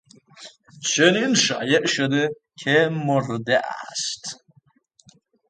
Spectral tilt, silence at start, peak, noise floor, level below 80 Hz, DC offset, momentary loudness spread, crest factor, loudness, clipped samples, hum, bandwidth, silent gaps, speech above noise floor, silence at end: -3.5 dB/octave; 0.4 s; 0 dBFS; -59 dBFS; -68 dBFS; under 0.1%; 12 LU; 22 dB; -21 LUFS; under 0.1%; none; 9.6 kHz; none; 38 dB; 1.15 s